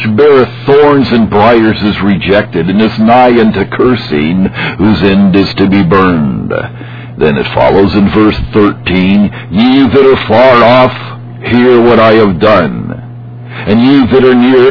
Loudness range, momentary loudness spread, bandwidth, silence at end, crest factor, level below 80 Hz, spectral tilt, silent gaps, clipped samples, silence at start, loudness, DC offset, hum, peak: 3 LU; 11 LU; 5.4 kHz; 0 s; 6 dB; -32 dBFS; -9 dB/octave; none; 3%; 0 s; -7 LUFS; 0.8%; none; 0 dBFS